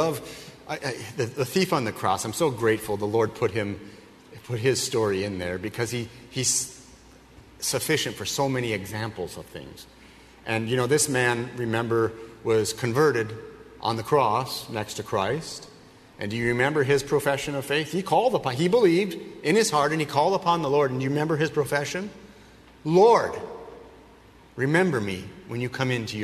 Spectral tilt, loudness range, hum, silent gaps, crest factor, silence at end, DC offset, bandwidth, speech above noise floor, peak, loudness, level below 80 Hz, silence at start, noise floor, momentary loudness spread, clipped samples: -4.5 dB/octave; 5 LU; none; none; 20 dB; 0 s; under 0.1%; 13.5 kHz; 27 dB; -6 dBFS; -25 LUFS; -58 dBFS; 0 s; -52 dBFS; 14 LU; under 0.1%